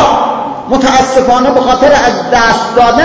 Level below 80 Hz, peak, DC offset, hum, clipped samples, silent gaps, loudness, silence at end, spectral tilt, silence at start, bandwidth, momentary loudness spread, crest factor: -32 dBFS; 0 dBFS; under 0.1%; none; 1%; none; -8 LUFS; 0 s; -4 dB/octave; 0 s; 8 kHz; 6 LU; 8 dB